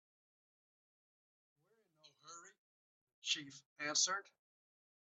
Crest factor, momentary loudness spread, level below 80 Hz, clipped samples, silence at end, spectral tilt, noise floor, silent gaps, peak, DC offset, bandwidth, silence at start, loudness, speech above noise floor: 26 dB; 22 LU; under -90 dBFS; under 0.1%; 0.95 s; 0.5 dB/octave; -72 dBFS; 2.58-3.07 s, 3.13-3.22 s, 3.66-3.76 s; -22 dBFS; under 0.1%; 8.2 kHz; 2.05 s; -38 LUFS; 31 dB